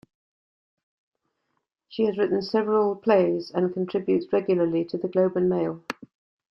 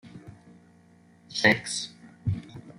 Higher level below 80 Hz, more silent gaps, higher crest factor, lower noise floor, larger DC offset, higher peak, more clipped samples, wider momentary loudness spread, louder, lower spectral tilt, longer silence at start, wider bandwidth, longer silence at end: second, -68 dBFS vs -58 dBFS; neither; second, 18 dB vs 26 dB; first, -77 dBFS vs -57 dBFS; neither; about the same, -8 dBFS vs -6 dBFS; neither; second, 8 LU vs 21 LU; first, -24 LUFS vs -27 LUFS; first, -8 dB/octave vs -4 dB/octave; first, 1.9 s vs 0.05 s; second, 6.8 kHz vs 14 kHz; first, 0.6 s vs 0.1 s